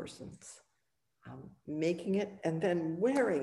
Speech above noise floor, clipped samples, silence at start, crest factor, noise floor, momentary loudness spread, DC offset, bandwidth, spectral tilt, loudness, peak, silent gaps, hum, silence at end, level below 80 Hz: 49 dB; under 0.1%; 0 s; 16 dB; -83 dBFS; 21 LU; under 0.1%; 12 kHz; -6.5 dB/octave; -34 LUFS; -20 dBFS; none; none; 0 s; -72 dBFS